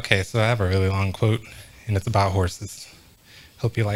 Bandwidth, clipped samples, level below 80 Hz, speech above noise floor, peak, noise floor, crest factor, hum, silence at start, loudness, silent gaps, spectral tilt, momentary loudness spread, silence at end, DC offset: 15.5 kHz; under 0.1%; -50 dBFS; 27 dB; 0 dBFS; -49 dBFS; 24 dB; none; 0 s; -23 LUFS; none; -5.5 dB/octave; 17 LU; 0 s; under 0.1%